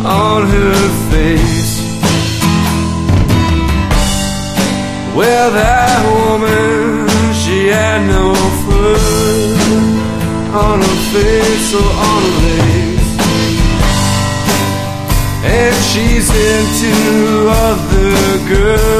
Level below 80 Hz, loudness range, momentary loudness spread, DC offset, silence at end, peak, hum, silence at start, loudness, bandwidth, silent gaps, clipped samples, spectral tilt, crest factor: -18 dBFS; 2 LU; 4 LU; under 0.1%; 0 s; 0 dBFS; none; 0 s; -11 LUFS; 15.5 kHz; none; under 0.1%; -5 dB/octave; 10 dB